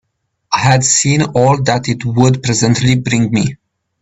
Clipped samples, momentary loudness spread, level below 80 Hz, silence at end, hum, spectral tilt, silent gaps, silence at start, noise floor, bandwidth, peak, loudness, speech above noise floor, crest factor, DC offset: under 0.1%; 7 LU; -44 dBFS; 0.45 s; none; -4.5 dB/octave; none; 0.5 s; -57 dBFS; 8.4 kHz; 0 dBFS; -13 LUFS; 45 dB; 14 dB; under 0.1%